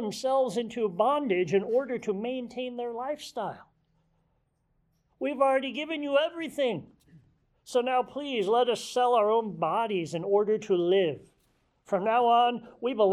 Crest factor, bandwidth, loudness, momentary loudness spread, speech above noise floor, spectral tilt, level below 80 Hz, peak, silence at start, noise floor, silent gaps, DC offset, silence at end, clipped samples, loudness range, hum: 16 dB; 14 kHz; -28 LUFS; 10 LU; 46 dB; -5 dB/octave; -72 dBFS; -12 dBFS; 0 s; -73 dBFS; none; under 0.1%; 0 s; under 0.1%; 6 LU; none